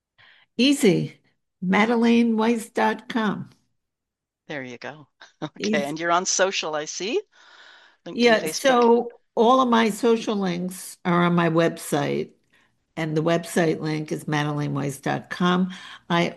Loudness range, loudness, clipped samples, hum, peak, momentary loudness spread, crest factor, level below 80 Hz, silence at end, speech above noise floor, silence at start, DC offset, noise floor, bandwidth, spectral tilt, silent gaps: 6 LU; -22 LUFS; under 0.1%; none; -6 dBFS; 16 LU; 18 dB; -68 dBFS; 0 s; 63 dB; 0.6 s; under 0.1%; -85 dBFS; 12.5 kHz; -5 dB/octave; none